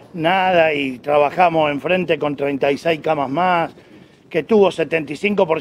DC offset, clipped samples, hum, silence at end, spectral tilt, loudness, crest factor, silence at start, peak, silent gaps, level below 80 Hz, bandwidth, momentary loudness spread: under 0.1%; under 0.1%; none; 0 s; -6 dB/octave; -18 LUFS; 16 dB; 0.15 s; 0 dBFS; none; -58 dBFS; 14.5 kHz; 6 LU